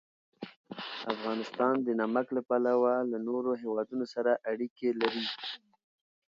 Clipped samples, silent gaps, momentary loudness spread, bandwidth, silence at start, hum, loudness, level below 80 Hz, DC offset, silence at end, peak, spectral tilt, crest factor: under 0.1%; 0.56-0.64 s, 4.70-4.76 s; 14 LU; 7.4 kHz; 0.4 s; none; -31 LUFS; -82 dBFS; under 0.1%; 0.7 s; -12 dBFS; -6 dB/octave; 20 dB